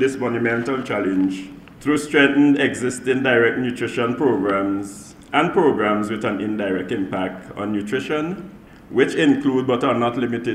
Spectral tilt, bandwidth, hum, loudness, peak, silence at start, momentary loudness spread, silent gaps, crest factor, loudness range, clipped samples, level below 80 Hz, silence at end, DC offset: -5.5 dB/octave; 13 kHz; none; -20 LUFS; -2 dBFS; 0 s; 11 LU; none; 18 dB; 4 LU; under 0.1%; -56 dBFS; 0 s; under 0.1%